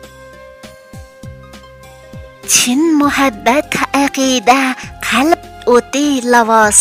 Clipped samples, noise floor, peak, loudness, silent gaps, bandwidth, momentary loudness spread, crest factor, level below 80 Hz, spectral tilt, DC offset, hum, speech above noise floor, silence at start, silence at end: 0.1%; -37 dBFS; 0 dBFS; -12 LUFS; none; 16.5 kHz; 7 LU; 14 dB; -42 dBFS; -2 dB/octave; under 0.1%; none; 25 dB; 0.05 s; 0 s